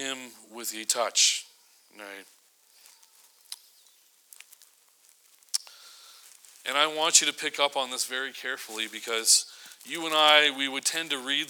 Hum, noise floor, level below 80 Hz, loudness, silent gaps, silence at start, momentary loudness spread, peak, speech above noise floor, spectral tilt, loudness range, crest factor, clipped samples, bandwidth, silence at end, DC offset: none; -61 dBFS; under -90 dBFS; -24 LUFS; none; 0 s; 24 LU; -4 dBFS; 34 dB; 1.5 dB/octave; 16 LU; 26 dB; under 0.1%; over 20 kHz; 0 s; under 0.1%